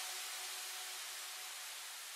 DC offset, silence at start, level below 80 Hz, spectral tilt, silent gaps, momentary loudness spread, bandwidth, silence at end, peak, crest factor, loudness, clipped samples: under 0.1%; 0 s; under -90 dBFS; 5.5 dB/octave; none; 3 LU; 16 kHz; 0 s; -32 dBFS; 14 dB; -44 LUFS; under 0.1%